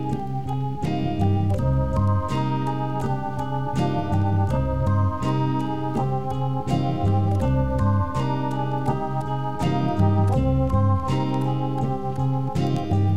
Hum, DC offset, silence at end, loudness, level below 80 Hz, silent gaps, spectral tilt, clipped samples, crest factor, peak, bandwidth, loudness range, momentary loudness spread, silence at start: none; 2%; 0 s; -24 LUFS; -36 dBFS; none; -8.5 dB/octave; under 0.1%; 14 dB; -8 dBFS; 9.6 kHz; 1 LU; 5 LU; 0 s